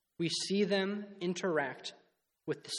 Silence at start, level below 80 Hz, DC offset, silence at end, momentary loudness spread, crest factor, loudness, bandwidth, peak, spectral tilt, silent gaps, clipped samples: 0.2 s; -82 dBFS; under 0.1%; 0 s; 14 LU; 18 dB; -34 LUFS; 12 kHz; -18 dBFS; -4 dB/octave; none; under 0.1%